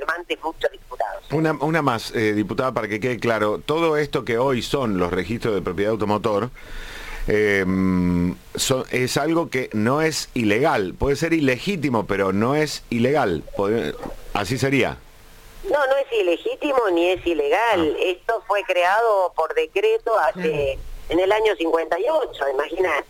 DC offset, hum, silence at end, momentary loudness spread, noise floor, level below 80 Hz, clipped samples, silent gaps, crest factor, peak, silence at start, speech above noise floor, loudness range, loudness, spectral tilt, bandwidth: under 0.1%; none; 0.05 s; 7 LU; -44 dBFS; -42 dBFS; under 0.1%; none; 16 dB; -4 dBFS; 0 s; 24 dB; 3 LU; -21 LUFS; -5 dB/octave; 17 kHz